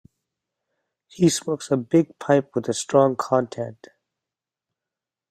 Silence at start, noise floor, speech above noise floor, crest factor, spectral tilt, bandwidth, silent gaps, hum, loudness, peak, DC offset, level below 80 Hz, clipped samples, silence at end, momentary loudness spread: 1.15 s; -88 dBFS; 67 dB; 20 dB; -5.5 dB/octave; 14.5 kHz; none; none; -22 LUFS; -4 dBFS; under 0.1%; -64 dBFS; under 0.1%; 1.55 s; 9 LU